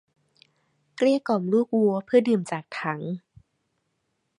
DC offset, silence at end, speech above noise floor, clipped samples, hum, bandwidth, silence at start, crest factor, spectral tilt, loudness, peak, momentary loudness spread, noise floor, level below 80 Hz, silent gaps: under 0.1%; 1.2 s; 52 dB; under 0.1%; none; 11 kHz; 0.95 s; 20 dB; -7 dB/octave; -24 LUFS; -6 dBFS; 11 LU; -76 dBFS; -74 dBFS; none